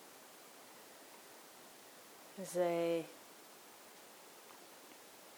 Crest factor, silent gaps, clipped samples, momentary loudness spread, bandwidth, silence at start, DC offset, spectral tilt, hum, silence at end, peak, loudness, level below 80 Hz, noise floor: 22 dB; none; under 0.1%; 19 LU; over 20 kHz; 0 s; under 0.1%; -4.5 dB/octave; none; 0 s; -24 dBFS; -39 LUFS; under -90 dBFS; -58 dBFS